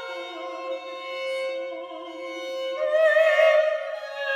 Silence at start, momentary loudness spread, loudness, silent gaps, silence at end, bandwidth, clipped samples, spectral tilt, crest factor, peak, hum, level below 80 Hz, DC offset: 0 s; 16 LU; -24 LUFS; none; 0 s; 12.5 kHz; under 0.1%; -0.5 dB/octave; 18 dB; -8 dBFS; none; -86 dBFS; under 0.1%